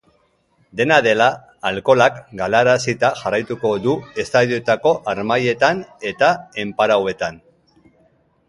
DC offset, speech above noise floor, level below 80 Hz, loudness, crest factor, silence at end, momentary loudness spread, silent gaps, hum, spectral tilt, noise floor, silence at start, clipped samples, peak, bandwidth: under 0.1%; 44 dB; -56 dBFS; -18 LUFS; 18 dB; 1.15 s; 10 LU; none; none; -4.5 dB/octave; -61 dBFS; 0.75 s; under 0.1%; 0 dBFS; 11.5 kHz